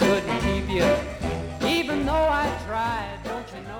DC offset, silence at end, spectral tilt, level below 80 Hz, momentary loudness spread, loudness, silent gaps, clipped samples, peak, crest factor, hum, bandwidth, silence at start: under 0.1%; 0 s; -5.5 dB/octave; -36 dBFS; 10 LU; -25 LUFS; none; under 0.1%; -8 dBFS; 16 dB; none; 20 kHz; 0 s